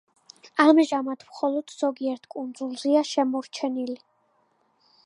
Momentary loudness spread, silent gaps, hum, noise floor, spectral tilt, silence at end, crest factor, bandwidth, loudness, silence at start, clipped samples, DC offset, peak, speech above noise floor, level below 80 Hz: 15 LU; none; none; -67 dBFS; -3 dB/octave; 1.1 s; 22 dB; 11 kHz; -25 LUFS; 0.45 s; under 0.1%; under 0.1%; -4 dBFS; 43 dB; -84 dBFS